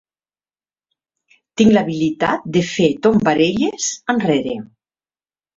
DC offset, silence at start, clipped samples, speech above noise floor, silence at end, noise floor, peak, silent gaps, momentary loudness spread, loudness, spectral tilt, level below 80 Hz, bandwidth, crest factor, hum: under 0.1%; 1.55 s; under 0.1%; over 74 dB; 0.9 s; under -90 dBFS; 0 dBFS; none; 8 LU; -17 LUFS; -5 dB/octave; -52 dBFS; 7.8 kHz; 18 dB; none